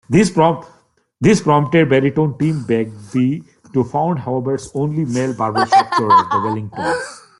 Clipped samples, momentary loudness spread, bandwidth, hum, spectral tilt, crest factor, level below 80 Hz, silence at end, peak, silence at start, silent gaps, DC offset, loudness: under 0.1%; 9 LU; 11.5 kHz; none; -6.5 dB/octave; 14 dB; -54 dBFS; 0.2 s; -2 dBFS; 0.1 s; none; under 0.1%; -17 LUFS